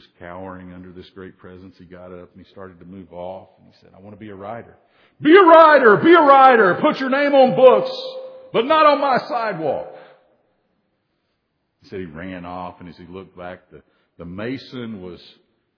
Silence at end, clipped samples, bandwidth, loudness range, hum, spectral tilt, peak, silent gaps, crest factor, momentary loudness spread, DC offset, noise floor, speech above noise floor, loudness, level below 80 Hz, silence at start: 0.6 s; under 0.1%; 5.4 kHz; 24 LU; none; -7.5 dB/octave; 0 dBFS; none; 18 dB; 27 LU; under 0.1%; -71 dBFS; 54 dB; -13 LUFS; -62 dBFS; 0.2 s